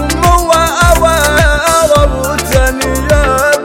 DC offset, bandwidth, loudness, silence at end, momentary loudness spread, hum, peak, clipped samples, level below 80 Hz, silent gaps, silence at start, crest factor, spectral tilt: under 0.1%; 17 kHz; -9 LUFS; 0 s; 4 LU; none; 0 dBFS; under 0.1%; -16 dBFS; none; 0 s; 10 dB; -4 dB/octave